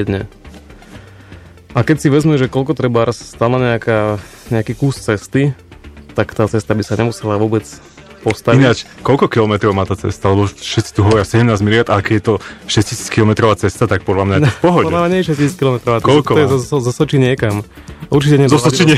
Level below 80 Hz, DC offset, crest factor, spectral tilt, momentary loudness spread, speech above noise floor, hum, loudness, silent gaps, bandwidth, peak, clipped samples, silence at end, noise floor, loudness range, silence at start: -40 dBFS; under 0.1%; 14 dB; -6 dB/octave; 9 LU; 24 dB; none; -14 LUFS; none; 14 kHz; 0 dBFS; under 0.1%; 0 s; -37 dBFS; 4 LU; 0 s